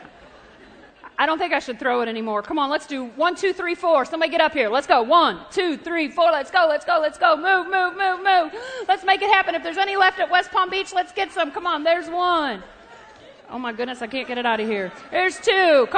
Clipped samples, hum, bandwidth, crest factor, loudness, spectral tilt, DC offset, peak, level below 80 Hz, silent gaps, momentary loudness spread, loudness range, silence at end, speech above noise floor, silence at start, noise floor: under 0.1%; none; 9.4 kHz; 20 dB; -20 LUFS; -3 dB/octave; under 0.1%; 0 dBFS; -60 dBFS; none; 10 LU; 5 LU; 0 s; 27 dB; 0 s; -47 dBFS